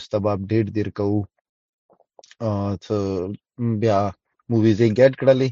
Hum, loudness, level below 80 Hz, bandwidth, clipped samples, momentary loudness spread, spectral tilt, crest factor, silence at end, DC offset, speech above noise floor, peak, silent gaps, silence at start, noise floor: none; -21 LUFS; -60 dBFS; 7.4 kHz; under 0.1%; 12 LU; -8 dB/octave; 18 dB; 0 s; under 0.1%; 32 dB; -2 dBFS; 1.41-1.89 s; 0 s; -52 dBFS